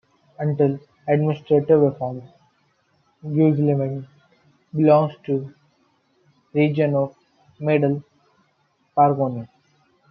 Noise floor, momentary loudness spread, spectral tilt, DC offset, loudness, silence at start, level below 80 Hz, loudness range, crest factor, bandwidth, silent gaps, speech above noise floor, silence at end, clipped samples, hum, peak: -66 dBFS; 14 LU; -11 dB/octave; under 0.1%; -21 LUFS; 0.4 s; -68 dBFS; 3 LU; 18 dB; 5 kHz; none; 46 dB; 0.65 s; under 0.1%; none; -4 dBFS